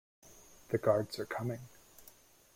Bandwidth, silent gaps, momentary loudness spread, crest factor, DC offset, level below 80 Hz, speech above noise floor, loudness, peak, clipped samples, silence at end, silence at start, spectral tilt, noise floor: 16.5 kHz; none; 26 LU; 24 dB; under 0.1%; -70 dBFS; 27 dB; -35 LUFS; -14 dBFS; under 0.1%; 0.55 s; 0.25 s; -6 dB/octave; -61 dBFS